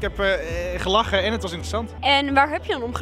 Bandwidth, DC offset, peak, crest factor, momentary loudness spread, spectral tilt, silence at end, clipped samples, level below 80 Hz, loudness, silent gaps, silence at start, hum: 15 kHz; under 0.1%; -4 dBFS; 18 dB; 9 LU; -4.5 dB/octave; 0 s; under 0.1%; -36 dBFS; -22 LUFS; none; 0 s; none